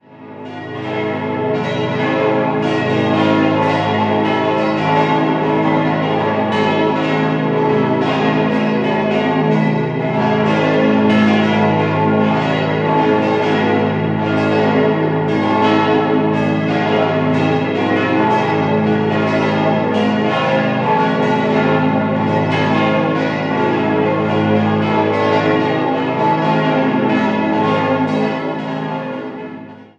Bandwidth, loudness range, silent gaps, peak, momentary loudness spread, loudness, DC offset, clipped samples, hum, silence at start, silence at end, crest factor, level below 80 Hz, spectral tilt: 8 kHz; 1 LU; none; 0 dBFS; 4 LU; -15 LUFS; under 0.1%; under 0.1%; none; 0.1 s; 0.15 s; 14 dB; -52 dBFS; -7.5 dB/octave